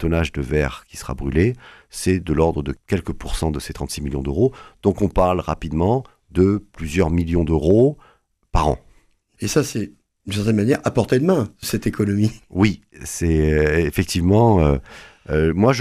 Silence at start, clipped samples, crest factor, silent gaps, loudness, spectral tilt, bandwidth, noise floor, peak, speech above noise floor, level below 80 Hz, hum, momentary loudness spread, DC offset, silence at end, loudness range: 0 s; under 0.1%; 18 dB; none; -20 LUFS; -6.5 dB/octave; 14.5 kHz; -56 dBFS; -2 dBFS; 37 dB; -32 dBFS; none; 11 LU; under 0.1%; 0 s; 4 LU